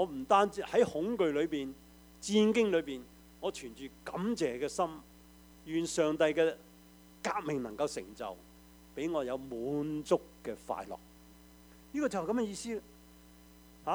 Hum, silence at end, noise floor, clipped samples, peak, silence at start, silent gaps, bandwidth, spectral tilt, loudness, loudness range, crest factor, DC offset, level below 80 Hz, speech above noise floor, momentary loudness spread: none; 0 s; -58 dBFS; under 0.1%; -12 dBFS; 0 s; none; over 20 kHz; -5 dB/octave; -34 LUFS; 6 LU; 22 dB; under 0.1%; -62 dBFS; 25 dB; 16 LU